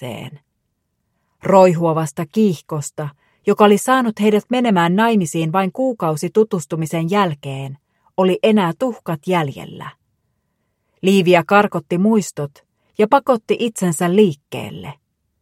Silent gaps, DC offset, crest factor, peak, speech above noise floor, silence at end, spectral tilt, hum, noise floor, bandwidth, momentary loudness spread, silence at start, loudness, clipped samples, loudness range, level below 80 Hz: none; under 0.1%; 18 dB; 0 dBFS; 55 dB; 0.5 s; -6 dB/octave; none; -71 dBFS; 16 kHz; 17 LU; 0 s; -17 LUFS; under 0.1%; 4 LU; -64 dBFS